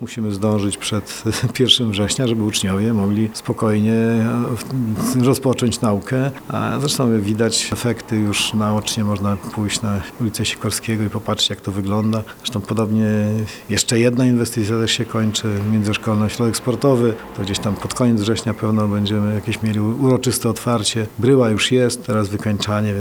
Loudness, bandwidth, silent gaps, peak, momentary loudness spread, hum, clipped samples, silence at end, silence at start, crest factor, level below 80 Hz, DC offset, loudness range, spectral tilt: -19 LUFS; over 20 kHz; none; 0 dBFS; 7 LU; none; under 0.1%; 0 s; 0 s; 18 dB; -48 dBFS; under 0.1%; 3 LU; -5 dB/octave